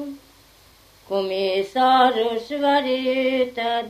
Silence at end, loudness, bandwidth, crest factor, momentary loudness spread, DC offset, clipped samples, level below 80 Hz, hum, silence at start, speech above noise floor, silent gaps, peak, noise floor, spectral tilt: 0 s; -21 LUFS; 15 kHz; 16 dB; 9 LU; under 0.1%; under 0.1%; -62 dBFS; none; 0 s; 32 dB; none; -4 dBFS; -52 dBFS; -4.5 dB/octave